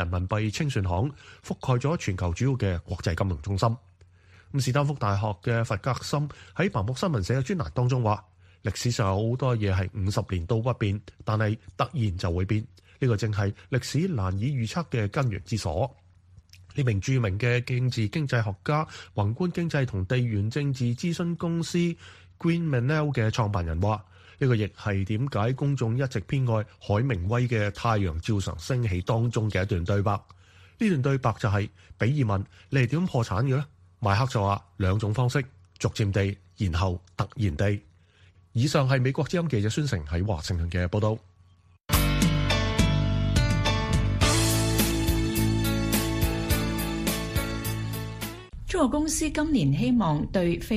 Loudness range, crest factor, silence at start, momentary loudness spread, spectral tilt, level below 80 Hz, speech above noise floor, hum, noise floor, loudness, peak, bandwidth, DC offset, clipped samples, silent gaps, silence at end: 4 LU; 20 dB; 0 s; 6 LU; -6 dB/octave; -40 dBFS; 32 dB; none; -58 dBFS; -27 LUFS; -8 dBFS; 15 kHz; under 0.1%; under 0.1%; none; 0 s